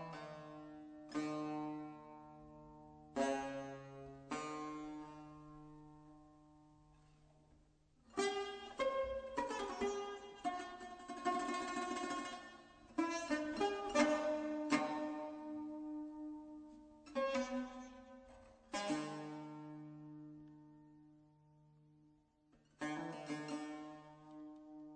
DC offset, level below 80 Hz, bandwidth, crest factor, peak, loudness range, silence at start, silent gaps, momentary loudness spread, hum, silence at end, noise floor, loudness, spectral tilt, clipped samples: under 0.1%; -72 dBFS; 9 kHz; 24 dB; -22 dBFS; 13 LU; 0 s; none; 20 LU; none; 0 s; -73 dBFS; -43 LUFS; -4 dB/octave; under 0.1%